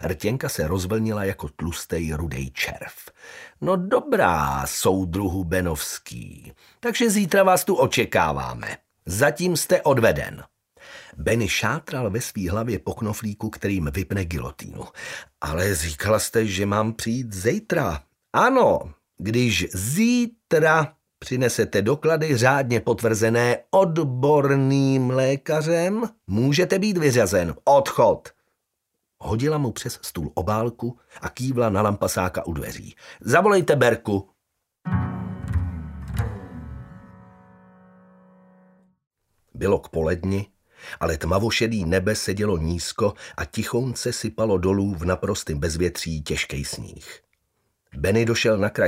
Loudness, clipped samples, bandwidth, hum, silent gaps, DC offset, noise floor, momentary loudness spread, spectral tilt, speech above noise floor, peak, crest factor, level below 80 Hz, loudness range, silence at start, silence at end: -22 LUFS; under 0.1%; 16 kHz; none; 39.07-39.11 s; under 0.1%; -78 dBFS; 15 LU; -5 dB/octave; 56 dB; -2 dBFS; 22 dB; -42 dBFS; 8 LU; 0 s; 0 s